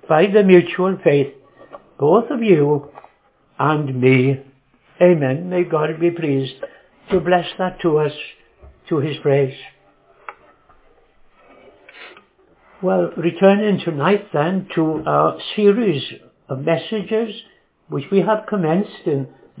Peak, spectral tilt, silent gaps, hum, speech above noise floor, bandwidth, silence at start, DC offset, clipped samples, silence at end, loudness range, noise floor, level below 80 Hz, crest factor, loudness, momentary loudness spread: 0 dBFS; -11 dB/octave; none; none; 40 dB; 4 kHz; 0.1 s; under 0.1%; under 0.1%; 0 s; 8 LU; -57 dBFS; -58 dBFS; 18 dB; -18 LUFS; 16 LU